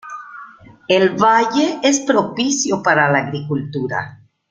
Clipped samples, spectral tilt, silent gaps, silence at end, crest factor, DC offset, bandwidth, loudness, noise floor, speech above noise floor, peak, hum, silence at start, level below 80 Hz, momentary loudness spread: under 0.1%; -4 dB/octave; none; 0.35 s; 16 dB; under 0.1%; 9.6 kHz; -16 LUFS; -40 dBFS; 24 dB; -2 dBFS; none; 0.05 s; -60 dBFS; 19 LU